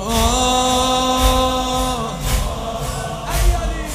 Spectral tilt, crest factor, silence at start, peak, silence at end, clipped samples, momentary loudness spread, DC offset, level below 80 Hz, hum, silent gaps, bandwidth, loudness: -3.5 dB/octave; 16 dB; 0 s; -2 dBFS; 0 s; under 0.1%; 9 LU; under 0.1%; -22 dBFS; none; none; 16 kHz; -18 LUFS